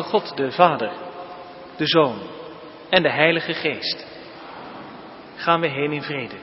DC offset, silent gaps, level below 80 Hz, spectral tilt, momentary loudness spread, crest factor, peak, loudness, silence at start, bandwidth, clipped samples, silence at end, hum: under 0.1%; none; -64 dBFS; -8.5 dB/octave; 21 LU; 22 dB; 0 dBFS; -21 LUFS; 0 s; 5.8 kHz; under 0.1%; 0 s; none